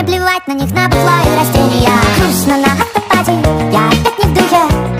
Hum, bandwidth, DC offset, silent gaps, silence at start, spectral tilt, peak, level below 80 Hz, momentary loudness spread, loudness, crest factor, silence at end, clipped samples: none; 16 kHz; under 0.1%; none; 0 s; -5 dB/octave; 0 dBFS; -24 dBFS; 3 LU; -11 LUFS; 10 dB; 0 s; under 0.1%